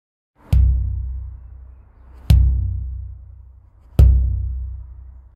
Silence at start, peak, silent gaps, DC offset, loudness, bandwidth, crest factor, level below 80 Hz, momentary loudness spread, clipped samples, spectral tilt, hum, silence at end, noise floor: 0.5 s; 0 dBFS; none; under 0.1%; -19 LUFS; 5.2 kHz; 18 dB; -20 dBFS; 22 LU; under 0.1%; -8 dB/octave; none; 0.25 s; -46 dBFS